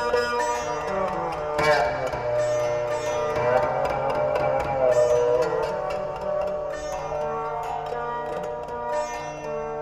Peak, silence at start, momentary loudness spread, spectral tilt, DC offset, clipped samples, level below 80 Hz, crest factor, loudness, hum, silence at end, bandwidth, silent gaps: -8 dBFS; 0 s; 9 LU; -4.5 dB/octave; under 0.1%; under 0.1%; -48 dBFS; 16 dB; -25 LUFS; none; 0 s; 14 kHz; none